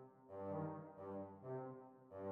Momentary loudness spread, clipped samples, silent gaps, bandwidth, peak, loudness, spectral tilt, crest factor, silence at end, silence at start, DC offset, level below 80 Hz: 10 LU; under 0.1%; none; 4.2 kHz; -34 dBFS; -51 LUFS; -10 dB/octave; 16 dB; 0 s; 0 s; under 0.1%; under -90 dBFS